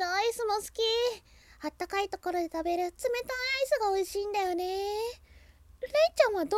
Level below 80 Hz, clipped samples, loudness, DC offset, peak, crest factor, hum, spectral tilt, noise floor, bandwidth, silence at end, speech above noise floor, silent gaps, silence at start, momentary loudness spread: -58 dBFS; under 0.1%; -30 LUFS; under 0.1%; -10 dBFS; 22 dB; none; -2.5 dB/octave; -56 dBFS; 17 kHz; 0 s; 26 dB; none; 0 s; 11 LU